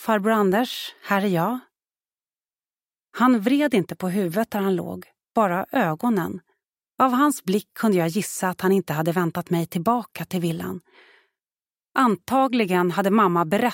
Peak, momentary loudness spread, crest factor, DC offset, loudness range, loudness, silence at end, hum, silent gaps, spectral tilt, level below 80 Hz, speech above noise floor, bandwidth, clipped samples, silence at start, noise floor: -4 dBFS; 9 LU; 18 dB; under 0.1%; 3 LU; -22 LUFS; 0 s; none; none; -6 dB/octave; -66 dBFS; over 68 dB; 17 kHz; under 0.1%; 0 s; under -90 dBFS